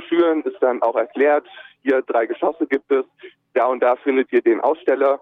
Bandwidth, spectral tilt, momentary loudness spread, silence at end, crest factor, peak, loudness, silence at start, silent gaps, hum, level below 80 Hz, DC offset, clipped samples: 4.2 kHz; -6.5 dB/octave; 4 LU; 0.05 s; 12 dB; -6 dBFS; -19 LUFS; 0 s; none; none; -72 dBFS; under 0.1%; under 0.1%